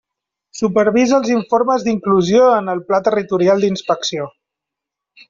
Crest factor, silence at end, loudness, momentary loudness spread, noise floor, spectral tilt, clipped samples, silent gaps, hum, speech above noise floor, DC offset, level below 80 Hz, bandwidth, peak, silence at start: 14 dB; 1 s; -15 LUFS; 10 LU; -83 dBFS; -5.5 dB/octave; under 0.1%; none; none; 68 dB; under 0.1%; -56 dBFS; 7.6 kHz; -2 dBFS; 0.55 s